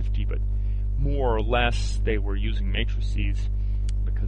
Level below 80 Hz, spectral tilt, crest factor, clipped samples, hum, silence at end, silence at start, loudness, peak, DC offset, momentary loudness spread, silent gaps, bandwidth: -24 dBFS; -6 dB/octave; 16 dB; under 0.1%; 50 Hz at -25 dBFS; 0 s; 0 s; -27 LUFS; -8 dBFS; under 0.1%; 5 LU; none; 8.6 kHz